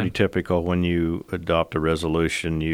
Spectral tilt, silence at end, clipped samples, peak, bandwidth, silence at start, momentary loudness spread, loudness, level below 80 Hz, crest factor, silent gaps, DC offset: -6.5 dB/octave; 0 s; under 0.1%; -6 dBFS; 15.5 kHz; 0 s; 3 LU; -23 LUFS; -44 dBFS; 16 dB; none; under 0.1%